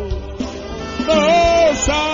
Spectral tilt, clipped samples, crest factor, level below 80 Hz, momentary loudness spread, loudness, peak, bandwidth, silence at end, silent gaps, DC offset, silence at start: -4 dB/octave; under 0.1%; 14 dB; -30 dBFS; 14 LU; -15 LUFS; -2 dBFS; 7.6 kHz; 0 s; none; under 0.1%; 0 s